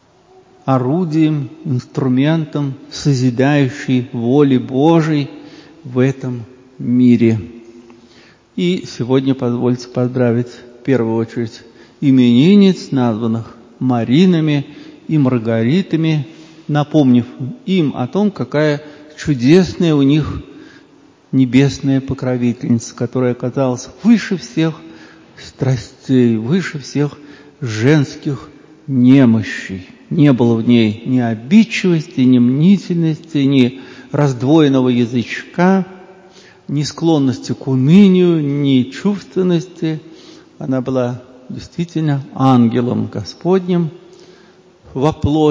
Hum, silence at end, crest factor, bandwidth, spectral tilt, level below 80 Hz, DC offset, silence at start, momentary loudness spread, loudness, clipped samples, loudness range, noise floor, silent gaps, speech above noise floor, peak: none; 0 s; 14 dB; 7.6 kHz; -7.5 dB/octave; -46 dBFS; under 0.1%; 0.65 s; 13 LU; -15 LUFS; under 0.1%; 4 LU; -47 dBFS; none; 34 dB; 0 dBFS